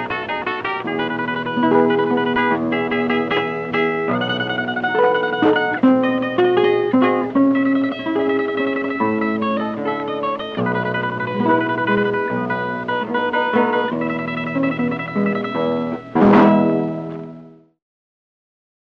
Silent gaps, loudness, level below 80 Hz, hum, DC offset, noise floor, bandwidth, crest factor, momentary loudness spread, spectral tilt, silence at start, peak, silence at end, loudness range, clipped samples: none; -18 LUFS; -56 dBFS; none; under 0.1%; -42 dBFS; 6.2 kHz; 18 dB; 7 LU; -8 dB/octave; 0 s; 0 dBFS; 1.3 s; 4 LU; under 0.1%